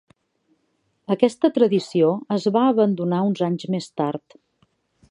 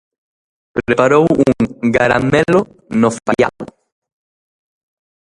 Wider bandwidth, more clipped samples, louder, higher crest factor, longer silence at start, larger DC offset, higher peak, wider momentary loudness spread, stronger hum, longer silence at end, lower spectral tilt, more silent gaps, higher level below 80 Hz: about the same, 11 kHz vs 11.5 kHz; neither; second, -21 LUFS vs -14 LUFS; about the same, 20 dB vs 16 dB; first, 1.1 s vs 0.75 s; neither; about the same, -2 dBFS vs 0 dBFS; about the same, 9 LU vs 11 LU; neither; second, 0.9 s vs 1.6 s; about the same, -7.5 dB/octave vs -6.5 dB/octave; neither; second, -70 dBFS vs -44 dBFS